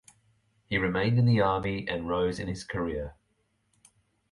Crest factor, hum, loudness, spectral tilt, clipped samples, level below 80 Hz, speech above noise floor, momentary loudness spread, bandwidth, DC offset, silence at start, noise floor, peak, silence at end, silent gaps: 18 dB; none; -28 LUFS; -7 dB/octave; under 0.1%; -50 dBFS; 46 dB; 11 LU; 11.5 kHz; under 0.1%; 0.7 s; -73 dBFS; -12 dBFS; 1.2 s; none